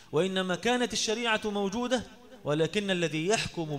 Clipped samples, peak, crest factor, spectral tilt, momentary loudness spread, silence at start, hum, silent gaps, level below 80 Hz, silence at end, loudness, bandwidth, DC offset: under 0.1%; -12 dBFS; 18 dB; -4 dB/octave; 5 LU; 0 s; none; none; -58 dBFS; 0 s; -29 LUFS; 15.5 kHz; 0.1%